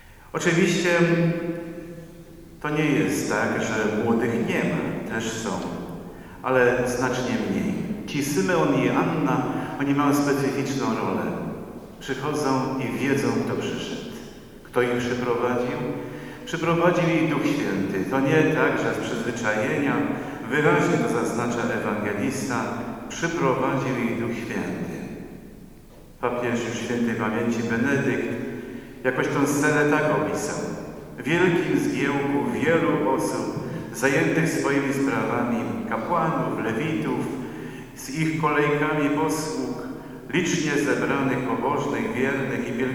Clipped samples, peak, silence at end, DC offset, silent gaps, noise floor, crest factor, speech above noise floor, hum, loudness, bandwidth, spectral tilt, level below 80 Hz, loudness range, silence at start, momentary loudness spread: under 0.1%; -6 dBFS; 0 s; under 0.1%; none; -46 dBFS; 18 dB; 23 dB; none; -24 LUFS; over 20 kHz; -5.5 dB/octave; -52 dBFS; 4 LU; 0.1 s; 12 LU